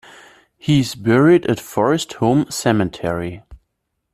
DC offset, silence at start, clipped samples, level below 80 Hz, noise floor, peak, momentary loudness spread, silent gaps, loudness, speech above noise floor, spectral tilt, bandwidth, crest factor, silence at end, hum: under 0.1%; 0.65 s; under 0.1%; -48 dBFS; -74 dBFS; -2 dBFS; 11 LU; none; -17 LUFS; 57 dB; -6 dB/octave; 14.5 kHz; 16 dB; 0.6 s; none